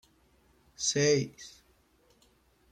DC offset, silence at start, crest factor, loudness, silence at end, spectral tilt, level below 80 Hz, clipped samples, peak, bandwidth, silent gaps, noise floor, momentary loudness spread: under 0.1%; 0.8 s; 20 dB; -29 LUFS; 1.2 s; -3.5 dB/octave; -68 dBFS; under 0.1%; -14 dBFS; 13 kHz; none; -67 dBFS; 23 LU